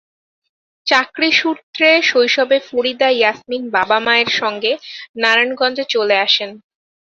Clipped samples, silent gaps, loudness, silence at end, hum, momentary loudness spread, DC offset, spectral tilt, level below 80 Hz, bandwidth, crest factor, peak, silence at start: under 0.1%; 1.63-1.73 s, 5.09-5.14 s; -15 LUFS; 0.55 s; none; 8 LU; under 0.1%; -2 dB/octave; -66 dBFS; 7.6 kHz; 16 dB; 0 dBFS; 0.85 s